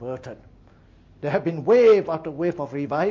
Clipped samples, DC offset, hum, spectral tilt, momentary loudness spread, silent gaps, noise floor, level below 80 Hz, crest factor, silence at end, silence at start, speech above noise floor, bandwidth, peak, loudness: under 0.1%; under 0.1%; none; -7.5 dB/octave; 18 LU; none; -52 dBFS; -56 dBFS; 14 dB; 0 s; 0 s; 31 dB; 7 kHz; -8 dBFS; -21 LUFS